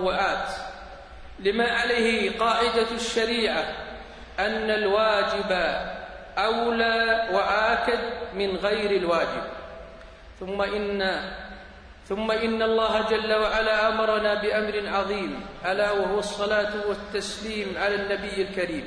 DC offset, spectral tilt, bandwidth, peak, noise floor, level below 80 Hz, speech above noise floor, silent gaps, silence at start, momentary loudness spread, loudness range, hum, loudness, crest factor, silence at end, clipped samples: under 0.1%; -4 dB/octave; 10.5 kHz; -8 dBFS; -45 dBFS; -48 dBFS; 21 dB; none; 0 s; 14 LU; 4 LU; none; -25 LUFS; 16 dB; 0 s; under 0.1%